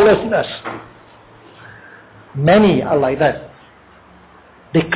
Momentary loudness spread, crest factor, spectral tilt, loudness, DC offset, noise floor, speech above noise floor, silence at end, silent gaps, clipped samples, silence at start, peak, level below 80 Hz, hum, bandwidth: 21 LU; 14 dB; -10.5 dB/octave; -15 LUFS; under 0.1%; -45 dBFS; 31 dB; 0 s; none; under 0.1%; 0 s; -4 dBFS; -46 dBFS; none; 4 kHz